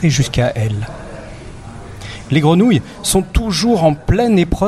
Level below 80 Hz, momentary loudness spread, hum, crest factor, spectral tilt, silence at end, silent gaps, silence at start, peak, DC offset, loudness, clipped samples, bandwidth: -28 dBFS; 20 LU; none; 14 dB; -5.5 dB/octave; 0 s; none; 0 s; 0 dBFS; under 0.1%; -15 LUFS; under 0.1%; 13.5 kHz